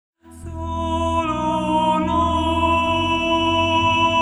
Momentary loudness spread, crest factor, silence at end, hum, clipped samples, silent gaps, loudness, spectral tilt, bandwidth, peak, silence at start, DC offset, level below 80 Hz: 10 LU; 12 dB; 0 s; none; under 0.1%; none; -19 LUFS; -5.5 dB/octave; 11.5 kHz; -8 dBFS; 0.25 s; under 0.1%; -36 dBFS